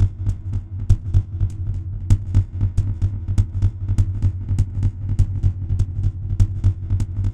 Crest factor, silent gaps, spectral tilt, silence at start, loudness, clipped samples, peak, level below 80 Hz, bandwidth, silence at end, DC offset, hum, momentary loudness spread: 18 dB; none; -8.5 dB/octave; 0 s; -22 LUFS; under 0.1%; -2 dBFS; -24 dBFS; 8.6 kHz; 0 s; under 0.1%; none; 6 LU